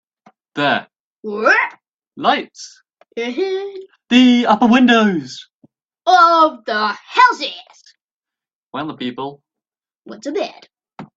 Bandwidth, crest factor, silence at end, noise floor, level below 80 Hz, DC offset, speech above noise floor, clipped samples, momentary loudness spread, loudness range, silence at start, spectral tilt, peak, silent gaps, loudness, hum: 7.8 kHz; 18 dB; 0.1 s; -89 dBFS; -64 dBFS; under 0.1%; 73 dB; under 0.1%; 21 LU; 14 LU; 0.55 s; -4.5 dB/octave; 0 dBFS; 1.00-1.11 s, 1.94-1.99 s, 5.55-5.60 s, 8.02-8.20 s, 8.55-8.67 s; -15 LUFS; none